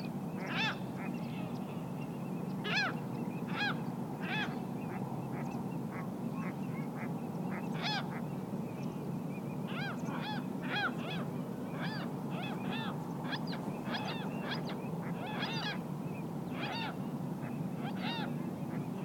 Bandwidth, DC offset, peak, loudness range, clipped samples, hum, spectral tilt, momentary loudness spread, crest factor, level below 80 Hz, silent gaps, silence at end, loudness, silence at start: 18 kHz; under 0.1%; -20 dBFS; 2 LU; under 0.1%; none; -6 dB/octave; 5 LU; 18 dB; -70 dBFS; none; 0 s; -38 LUFS; 0 s